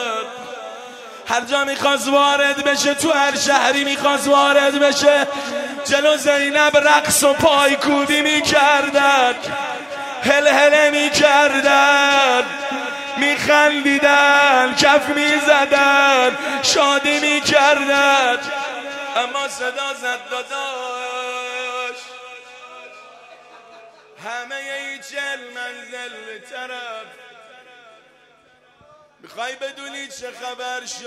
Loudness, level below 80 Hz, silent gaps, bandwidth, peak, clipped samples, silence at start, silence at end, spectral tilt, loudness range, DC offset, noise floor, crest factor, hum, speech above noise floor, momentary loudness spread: -15 LUFS; -58 dBFS; none; 15.5 kHz; 0 dBFS; under 0.1%; 0 s; 0 s; -1.5 dB/octave; 18 LU; under 0.1%; -53 dBFS; 18 dB; none; 37 dB; 18 LU